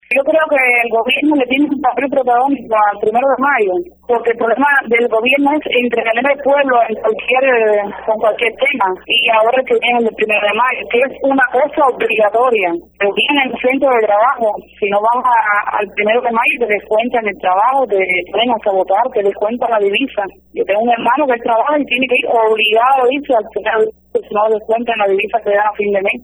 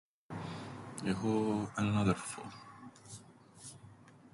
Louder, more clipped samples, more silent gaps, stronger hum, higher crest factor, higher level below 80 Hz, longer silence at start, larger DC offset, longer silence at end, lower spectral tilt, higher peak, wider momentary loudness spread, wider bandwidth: first, -13 LUFS vs -36 LUFS; neither; neither; neither; second, 12 dB vs 22 dB; first, -54 dBFS vs -62 dBFS; second, 0.1 s vs 0.3 s; neither; about the same, 0.05 s vs 0.05 s; about the same, -5 dB/octave vs -6 dB/octave; first, -2 dBFS vs -16 dBFS; second, 5 LU vs 20 LU; first, over 20 kHz vs 11.5 kHz